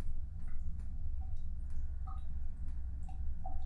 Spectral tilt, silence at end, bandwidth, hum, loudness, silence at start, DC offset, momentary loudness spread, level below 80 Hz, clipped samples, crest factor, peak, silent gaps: -8.5 dB/octave; 0 s; 1.6 kHz; none; -45 LUFS; 0 s; under 0.1%; 2 LU; -38 dBFS; under 0.1%; 10 dB; -24 dBFS; none